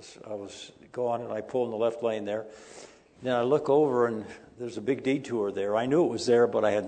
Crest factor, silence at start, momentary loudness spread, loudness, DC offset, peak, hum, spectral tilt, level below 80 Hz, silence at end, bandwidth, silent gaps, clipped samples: 16 dB; 0 s; 18 LU; -27 LUFS; under 0.1%; -12 dBFS; none; -6 dB/octave; -70 dBFS; 0 s; 9.2 kHz; none; under 0.1%